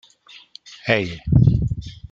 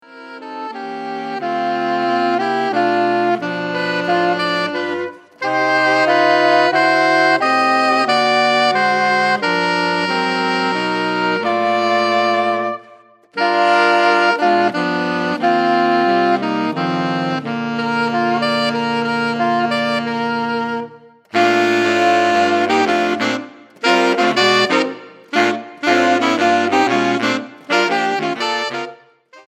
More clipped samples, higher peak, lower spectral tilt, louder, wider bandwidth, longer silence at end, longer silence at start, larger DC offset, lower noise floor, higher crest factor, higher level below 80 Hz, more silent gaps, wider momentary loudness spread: neither; about the same, -2 dBFS vs -2 dBFS; first, -7.5 dB/octave vs -4.5 dB/octave; second, -19 LUFS vs -16 LUFS; second, 7.4 kHz vs 14 kHz; about the same, 0.15 s vs 0.1 s; first, 0.65 s vs 0.1 s; neither; about the same, -48 dBFS vs -46 dBFS; about the same, 20 dB vs 16 dB; first, -34 dBFS vs -72 dBFS; neither; first, 21 LU vs 10 LU